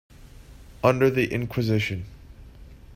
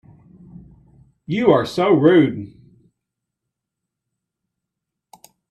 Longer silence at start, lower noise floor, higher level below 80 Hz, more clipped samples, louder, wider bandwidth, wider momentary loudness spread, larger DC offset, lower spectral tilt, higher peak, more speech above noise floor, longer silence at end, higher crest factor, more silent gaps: second, 0.2 s vs 1.3 s; second, -46 dBFS vs -82 dBFS; first, -48 dBFS vs -58 dBFS; neither; second, -24 LUFS vs -16 LUFS; first, 16 kHz vs 12 kHz; second, 12 LU vs 17 LU; neither; about the same, -7 dB/octave vs -7.5 dB/octave; about the same, -4 dBFS vs -2 dBFS; second, 23 dB vs 67 dB; second, 0 s vs 3.05 s; about the same, 22 dB vs 20 dB; neither